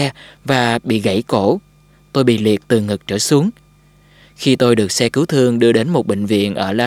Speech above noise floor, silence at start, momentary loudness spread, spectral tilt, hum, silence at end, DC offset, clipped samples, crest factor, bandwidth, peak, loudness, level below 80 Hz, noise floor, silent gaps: 34 dB; 0 s; 7 LU; -5 dB/octave; 50 Hz at -40 dBFS; 0 s; under 0.1%; under 0.1%; 16 dB; 16.5 kHz; 0 dBFS; -16 LUFS; -54 dBFS; -49 dBFS; none